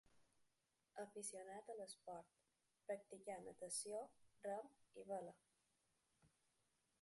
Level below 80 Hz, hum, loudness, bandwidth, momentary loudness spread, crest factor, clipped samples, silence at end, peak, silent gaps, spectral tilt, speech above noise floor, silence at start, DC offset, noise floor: under -90 dBFS; none; -54 LUFS; 11.5 kHz; 13 LU; 20 dB; under 0.1%; 0.75 s; -36 dBFS; none; -2.5 dB/octave; 34 dB; 0.15 s; under 0.1%; -88 dBFS